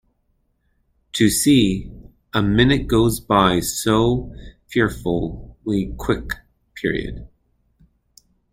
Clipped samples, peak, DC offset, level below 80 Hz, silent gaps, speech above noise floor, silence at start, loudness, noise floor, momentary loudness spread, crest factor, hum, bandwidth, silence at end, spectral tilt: under 0.1%; -2 dBFS; under 0.1%; -36 dBFS; none; 48 dB; 1.15 s; -19 LUFS; -66 dBFS; 15 LU; 20 dB; none; 16.5 kHz; 1.25 s; -5 dB/octave